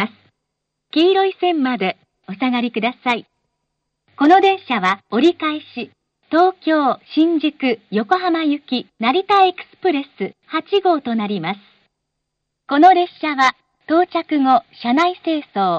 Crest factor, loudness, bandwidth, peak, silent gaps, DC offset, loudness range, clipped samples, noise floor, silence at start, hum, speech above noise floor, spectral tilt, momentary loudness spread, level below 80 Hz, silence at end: 16 dB; -17 LUFS; 8 kHz; -2 dBFS; none; under 0.1%; 3 LU; under 0.1%; -77 dBFS; 0 s; none; 60 dB; -5.5 dB/octave; 11 LU; -68 dBFS; 0 s